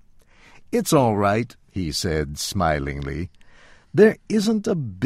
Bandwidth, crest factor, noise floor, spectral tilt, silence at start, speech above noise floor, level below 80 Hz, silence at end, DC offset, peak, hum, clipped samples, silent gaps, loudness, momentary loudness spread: 16 kHz; 20 dB; -51 dBFS; -5.5 dB/octave; 0.7 s; 30 dB; -40 dBFS; 0 s; under 0.1%; -2 dBFS; none; under 0.1%; none; -22 LUFS; 13 LU